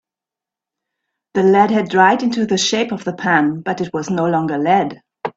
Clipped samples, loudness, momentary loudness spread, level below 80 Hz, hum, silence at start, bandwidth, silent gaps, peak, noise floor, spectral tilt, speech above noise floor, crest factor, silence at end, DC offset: under 0.1%; -16 LUFS; 9 LU; -60 dBFS; none; 1.35 s; 8 kHz; none; 0 dBFS; -87 dBFS; -4.5 dB/octave; 71 dB; 16 dB; 0.05 s; under 0.1%